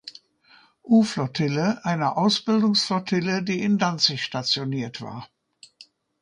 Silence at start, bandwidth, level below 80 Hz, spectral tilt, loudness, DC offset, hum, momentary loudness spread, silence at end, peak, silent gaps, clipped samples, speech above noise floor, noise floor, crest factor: 0.05 s; 10.5 kHz; -66 dBFS; -5 dB/octave; -23 LUFS; under 0.1%; none; 11 LU; 0.4 s; -6 dBFS; none; under 0.1%; 34 dB; -57 dBFS; 18 dB